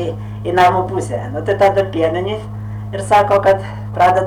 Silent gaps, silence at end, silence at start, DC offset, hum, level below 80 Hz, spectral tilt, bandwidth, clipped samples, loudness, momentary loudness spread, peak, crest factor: none; 0 s; 0 s; under 0.1%; none; -40 dBFS; -6 dB/octave; 17 kHz; under 0.1%; -16 LUFS; 12 LU; -4 dBFS; 10 dB